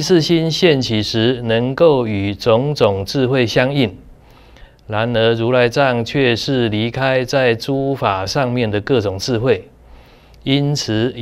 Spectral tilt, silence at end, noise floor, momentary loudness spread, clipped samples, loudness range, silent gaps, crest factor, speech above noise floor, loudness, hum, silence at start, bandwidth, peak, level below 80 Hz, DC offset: -5.5 dB/octave; 0 s; -43 dBFS; 5 LU; under 0.1%; 3 LU; none; 16 dB; 28 dB; -16 LUFS; none; 0 s; 15.5 kHz; 0 dBFS; -44 dBFS; under 0.1%